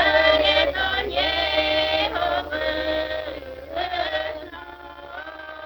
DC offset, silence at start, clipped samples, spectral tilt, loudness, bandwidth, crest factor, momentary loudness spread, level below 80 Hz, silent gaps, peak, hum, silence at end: under 0.1%; 0 s; under 0.1%; -4.5 dB/octave; -22 LUFS; over 20 kHz; 18 dB; 19 LU; -42 dBFS; none; -6 dBFS; none; 0 s